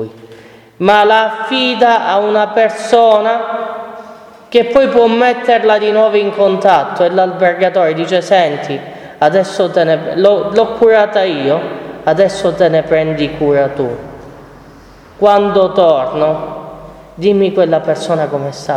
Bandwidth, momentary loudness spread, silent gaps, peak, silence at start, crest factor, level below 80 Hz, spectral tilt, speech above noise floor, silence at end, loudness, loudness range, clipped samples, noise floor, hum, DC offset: 11.5 kHz; 11 LU; none; 0 dBFS; 0 s; 12 dB; -48 dBFS; -5.5 dB/octave; 27 dB; 0 s; -12 LUFS; 3 LU; 0.1%; -38 dBFS; none; under 0.1%